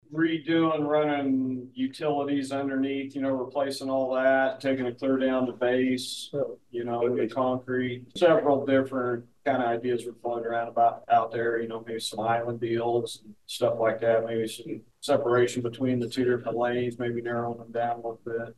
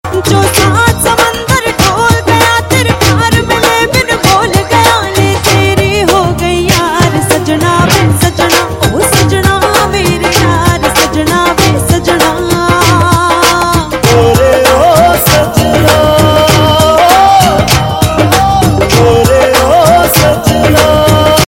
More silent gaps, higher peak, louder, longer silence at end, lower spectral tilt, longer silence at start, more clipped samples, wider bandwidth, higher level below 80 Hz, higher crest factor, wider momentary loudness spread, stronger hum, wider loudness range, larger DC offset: neither; second, -10 dBFS vs 0 dBFS; second, -27 LUFS vs -7 LUFS; about the same, 0.05 s vs 0 s; about the same, -5.5 dB/octave vs -4.5 dB/octave; about the same, 0.1 s vs 0.05 s; second, under 0.1% vs 1%; second, 12.5 kHz vs 17.5 kHz; second, -70 dBFS vs -24 dBFS; first, 18 dB vs 8 dB; first, 9 LU vs 4 LU; neither; about the same, 2 LU vs 2 LU; neither